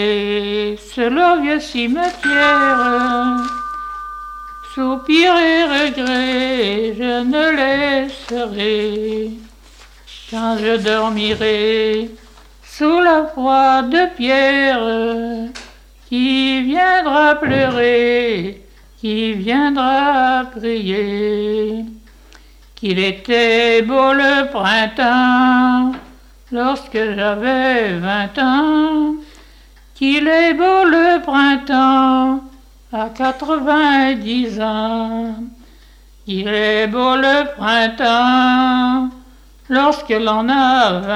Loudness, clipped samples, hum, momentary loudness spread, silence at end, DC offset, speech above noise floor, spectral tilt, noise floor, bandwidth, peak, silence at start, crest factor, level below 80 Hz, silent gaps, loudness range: -15 LUFS; under 0.1%; none; 12 LU; 0 s; under 0.1%; 29 dB; -5 dB/octave; -44 dBFS; 11.5 kHz; -2 dBFS; 0 s; 14 dB; -44 dBFS; none; 5 LU